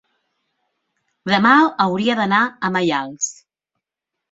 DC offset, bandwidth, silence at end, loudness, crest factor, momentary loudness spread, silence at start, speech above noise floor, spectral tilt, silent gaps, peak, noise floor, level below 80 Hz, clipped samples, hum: under 0.1%; 8 kHz; 1 s; -17 LUFS; 18 dB; 12 LU; 1.25 s; 66 dB; -4 dB/octave; none; -2 dBFS; -82 dBFS; -64 dBFS; under 0.1%; none